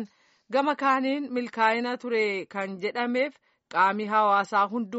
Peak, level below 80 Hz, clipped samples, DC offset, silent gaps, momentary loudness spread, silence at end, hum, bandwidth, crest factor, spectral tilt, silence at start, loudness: -8 dBFS; -82 dBFS; under 0.1%; under 0.1%; none; 9 LU; 0 s; none; 8 kHz; 18 dB; -2 dB/octave; 0 s; -26 LUFS